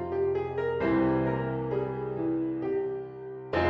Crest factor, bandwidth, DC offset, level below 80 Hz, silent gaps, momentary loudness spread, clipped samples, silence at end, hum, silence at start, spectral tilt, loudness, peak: 16 dB; 5.6 kHz; under 0.1%; -52 dBFS; none; 8 LU; under 0.1%; 0 s; none; 0 s; -9.5 dB/octave; -30 LUFS; -14 dBFS